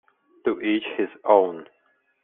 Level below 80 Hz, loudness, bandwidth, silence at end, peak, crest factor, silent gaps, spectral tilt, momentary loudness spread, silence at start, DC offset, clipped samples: -70 dBFS; -23 LUFS; 3.9 kHz; 0.6 s; -4 dBFS; 20 dB; none; -2.5 dB/octave; 10 LU; 0.45 s; under 0.1%; under 0.1%